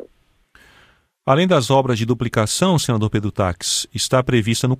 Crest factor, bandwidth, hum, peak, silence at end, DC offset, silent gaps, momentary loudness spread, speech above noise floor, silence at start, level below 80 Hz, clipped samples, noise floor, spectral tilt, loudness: 18 dB; 15.5 kHz; none; -2 dBFS; 0 s; under 0.1%; none; 5 LU; 39 dB; 1.25 s; -46 dBFS; under 0.1%; -56 dBFS; -5 dB/octave; -18 LUFS